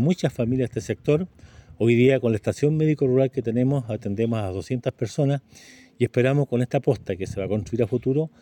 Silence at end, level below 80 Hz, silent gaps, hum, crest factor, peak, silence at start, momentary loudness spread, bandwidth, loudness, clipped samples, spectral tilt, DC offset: 0.15 s; -54 dBFS; none; none; 16 dB; -6 dBFS; 0 s; 8 LU; 16.5 kHz; -23 LUFS; under 0.1%; -8 dB/octave; under 0.1%